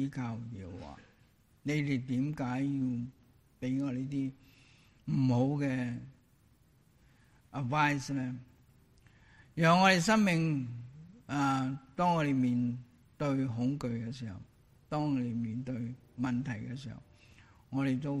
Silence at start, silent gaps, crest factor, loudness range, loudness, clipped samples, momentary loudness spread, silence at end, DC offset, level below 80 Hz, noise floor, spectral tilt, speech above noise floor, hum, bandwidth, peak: 0 s; none; 22 dB; 8 LU; -33 LUFS; under 0.1%; 18 LU; 0 s; under 0.1%; -64 dBFS; -66 dBFS; -6 dB/octave; 34 dB; none; 13 kHz; -10 dBFS